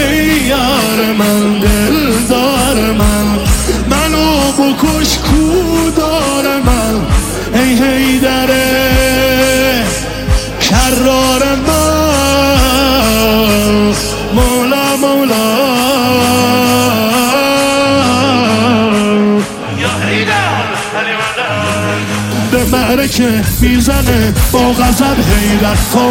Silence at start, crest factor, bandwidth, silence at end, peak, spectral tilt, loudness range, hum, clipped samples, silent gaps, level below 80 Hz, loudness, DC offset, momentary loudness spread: 0 s; 10 dB; 16.5 kHz; 0 s; 0 dBFS; -4.5 dB/octave; 2 LU; none; under 0.1%; none; -20 dBFS; -10 LUFS; under 0.1%; 4 LU